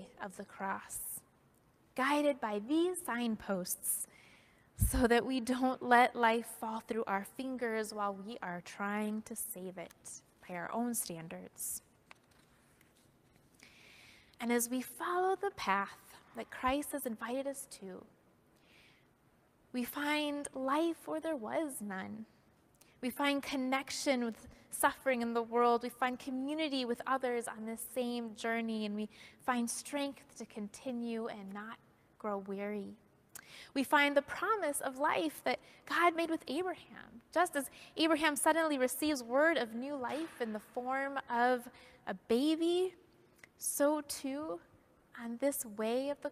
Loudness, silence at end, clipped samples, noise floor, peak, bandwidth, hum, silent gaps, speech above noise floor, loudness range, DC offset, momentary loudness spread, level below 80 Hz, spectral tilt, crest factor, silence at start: -36 LUFS; 0 s; under 0.1%; -70 dBFS; -14 dBFS; 15.5 kHz; none; none; 34 dB; 9 LU; under 0.1%; 16 LU; -58 dBFS; -3.5 dB/octave; 24 dB; 0 s